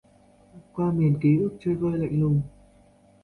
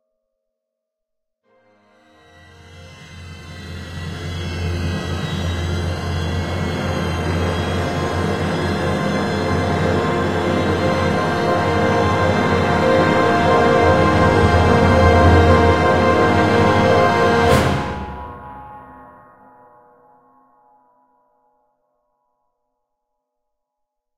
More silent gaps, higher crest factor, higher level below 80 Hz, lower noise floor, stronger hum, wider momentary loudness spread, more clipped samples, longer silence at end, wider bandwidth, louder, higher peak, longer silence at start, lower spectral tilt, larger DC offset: neither; about the same, 16 dB vs 18 dB; second, -54 dBFS vs -34 dBFS; second, -57 dBFS vs -80 dBFS; neither; second, 7 LU vs 16 LU; neither; second, 0.75 s vs 5.05 s; second, 4.3 kHz vs 13.5 kHz; second, -24 LUFS vs -17 LUFS; second, -10 dBFS vs -2 dBFS; second, 0.55 s vs 2.6 s; first, -11 dB/octave vs -6.5 dB/octave; neither